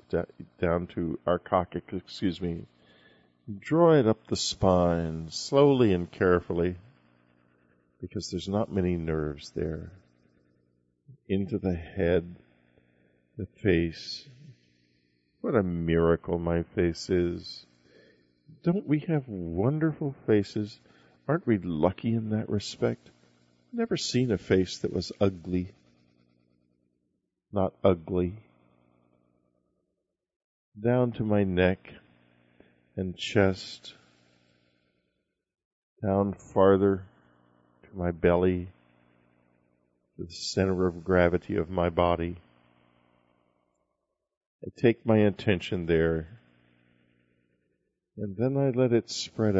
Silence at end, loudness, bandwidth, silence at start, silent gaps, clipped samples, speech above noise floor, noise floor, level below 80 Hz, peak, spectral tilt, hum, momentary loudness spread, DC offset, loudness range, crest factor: 0 s; -28 LUFS; 8 kHz; 0.1 s; 30.36-30.72 s, 35.65-35.96 s, 44.37-44.59 s; under 0.1%; 56 dB; -82 dBFS; -52 dBFS; -8 dBFS; -6.5 dB/octave; 60 Hz at -55 dBFS; 15 LU; under 0.1%; 7 LU; 22 dB